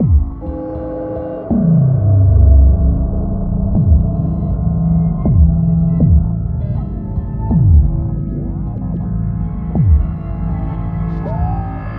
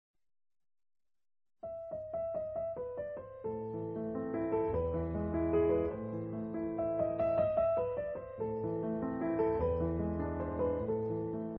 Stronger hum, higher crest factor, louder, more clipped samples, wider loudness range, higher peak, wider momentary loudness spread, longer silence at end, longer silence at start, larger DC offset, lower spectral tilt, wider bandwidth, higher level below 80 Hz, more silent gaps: neither; about the same, 12 dB vs 16 dB; first, -15 LUFS vs -36 LUFS; neither; second, 5 LU vs 8 LU; first, 0 dBFS vs -20 dBFS; about the same, 11 LU vs 10 LU; about the same, 0 s vs 0 s; second, 0 s vs 1.65 s; neither; first, -14.5 dB/octave vs -9.5 dB/octave; second, 2.3 kHz vs 4.1 kHz; first, -18 dBFS vs -56 dBFS; neither